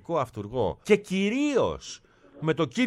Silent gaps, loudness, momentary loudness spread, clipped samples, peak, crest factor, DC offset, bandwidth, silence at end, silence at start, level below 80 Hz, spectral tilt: none; -27 LUFS; 12 LU; under 0.1%; -6 dBFS; 20 dB; under 0.1%; 12.5 kHz; 0 s; 0.1 s; -54 dBFS; -5.5 dB/octave